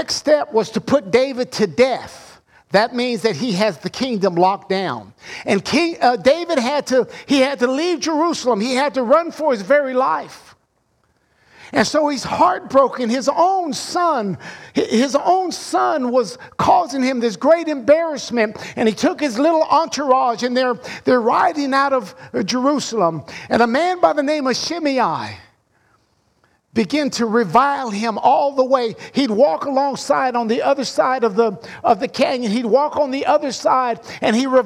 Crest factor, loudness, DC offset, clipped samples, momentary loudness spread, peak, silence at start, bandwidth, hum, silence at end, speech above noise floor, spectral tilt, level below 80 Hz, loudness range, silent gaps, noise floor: 16 dB; -18 LUFS; under 0.1%; under 0.1%; 6 LU; -2 dBFS; 0 s; 14.5 kHz; none; 0 s; 46 dB; -4.5 dB/octave; -60 dBFS; 3 LU; none; -64 dBFS